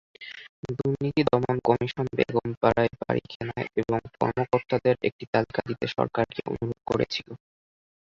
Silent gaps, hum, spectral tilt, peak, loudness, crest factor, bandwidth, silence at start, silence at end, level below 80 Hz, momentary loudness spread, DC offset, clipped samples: 0.49-0.63 s, 2.57-2.61 s, 3.35-3.40 s, 5.12-5.19 s, 5.27-5.33 s; none; -7.5 dB/octave; -6 dBFS; -27 LUFS; 22 dB; 7.4 kHz; 0.2 s; 0.65 s; -54 dBFS; 11 LU; under 0.1%; under 0.1%